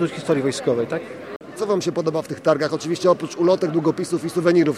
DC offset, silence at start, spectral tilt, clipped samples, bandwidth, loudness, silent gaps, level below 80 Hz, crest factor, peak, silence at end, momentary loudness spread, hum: under 0.1%; 0 s; -6 dB/octave; under 0.1%; 13 kHz; -21 LUFS; 1.36-1.40 s; -66 dBFS; 18 dB; -4 dBFS; 0 s; 10 LU; none